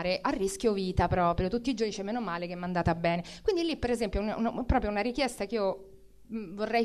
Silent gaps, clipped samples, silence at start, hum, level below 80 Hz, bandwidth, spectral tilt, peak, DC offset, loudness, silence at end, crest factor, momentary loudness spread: none; under 0.1%; 0 s; none; -44 dBFS; 13.5 kHz; -5.5 dB/octave; -12 dBFS; 0.1%; -30 LUFS; 0 s; 18 dB; 6 LU